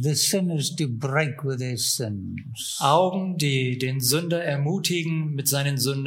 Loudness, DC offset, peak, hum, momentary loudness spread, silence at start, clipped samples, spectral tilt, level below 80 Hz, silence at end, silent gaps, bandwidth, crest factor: -24 LUFS; under 0.1%; -4 dBFS; none; 7 LU; 0 s; under 0.1%; -4 dB/octave; -66 dBFS; 0 s; none; 16.5 kHz; 20 dB